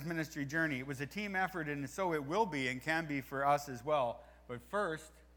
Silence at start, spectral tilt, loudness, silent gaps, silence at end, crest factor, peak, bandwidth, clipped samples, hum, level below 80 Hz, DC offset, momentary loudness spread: 0 s; -5 dB/octave; -37 LUFS; none; 0.15 s; 18 dB; -18 dBFS; over 20 kHz; under 0.1%; none; -64 dBFS; under 0.1%; 7 LU